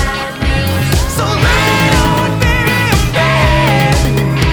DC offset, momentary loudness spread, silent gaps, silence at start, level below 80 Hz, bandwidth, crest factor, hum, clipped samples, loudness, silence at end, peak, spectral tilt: under 0.1%; 4 LU; none; 0 s; -18 dBFS; over 20 kHz; 12 dB; none; under 0.1%; -12 LUFS; 0 s; 0 dBFS; -5 dB/octave